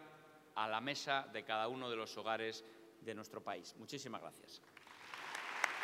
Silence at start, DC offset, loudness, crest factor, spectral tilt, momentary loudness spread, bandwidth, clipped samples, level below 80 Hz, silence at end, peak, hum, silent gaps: 0 s; under 0.1%; -43 LUFS; 30 dB; -3 dB/octave; 18 LU; 16 kHz; under 0.1%; under -90 dBFS; 0 s; -14 dBFS; none; none